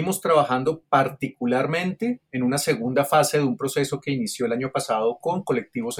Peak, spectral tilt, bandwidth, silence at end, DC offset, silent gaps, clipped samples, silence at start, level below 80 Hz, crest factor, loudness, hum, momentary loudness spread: -6 dBFS; -5 dB/octave; 18 kHz; 0 s; under 0.1%; none; under 0.1%; 0 s; -64 dBFS; 18 dB; -23 LUFS; none; 7 LU